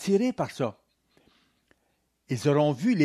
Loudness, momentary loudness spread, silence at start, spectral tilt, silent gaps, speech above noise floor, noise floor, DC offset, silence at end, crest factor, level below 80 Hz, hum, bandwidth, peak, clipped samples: -27 LUFS; 9 LU; 0 s; -6.5 dB/octave; none; 49 dB; -73 dBFS; under 0.1%; 0 s; 16 dB; -70 dBFS; none; 13.5 kHz; -10 dBFS; under 0.1%